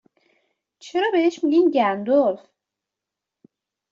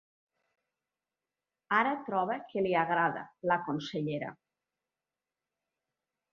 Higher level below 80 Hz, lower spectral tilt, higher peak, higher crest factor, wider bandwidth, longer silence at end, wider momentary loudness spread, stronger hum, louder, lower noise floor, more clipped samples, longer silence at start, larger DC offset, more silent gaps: first, -70 dBFS vs -76 dBFS; first, -5.5 dB/octave vs -4 dB/octave; first, -6 dBFS vs -12 dBFS; second, 16 dB vs 22 dB; about the same, 7.4 kHz vs 7 kHz; second, 1.55 s vs 2 s; about the same, 8 LU vs 8 LU; neither; first, -20 LUFS vs -32 LUFS; second, -86 dBFS vs under -90 dBFS; neither; second, 0.85 s vs 1.7 s; neither; neither